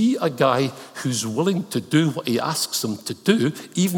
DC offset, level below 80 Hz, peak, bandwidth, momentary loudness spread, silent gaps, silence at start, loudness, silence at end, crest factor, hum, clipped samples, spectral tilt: under 0.1%; -70 dBFS; -2 dBFS; 19 kHz; 6 LU; none; 0 s; -22 LUFS; 0 s; 20 dB; none; under 0.1%; -5 dB/octave